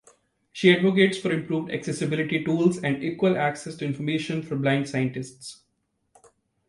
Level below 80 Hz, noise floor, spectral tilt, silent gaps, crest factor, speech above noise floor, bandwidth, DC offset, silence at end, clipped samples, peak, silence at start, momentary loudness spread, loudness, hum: -64 dBFS; -74 dBFS; -6 dB/octave; none; 20 dB; 50 dB; 11.5 kHz; under 0.1%; 1.15 s; under 0.1%; -4 dBFS; 0.55 s; 12 LU; -24 LUFS; none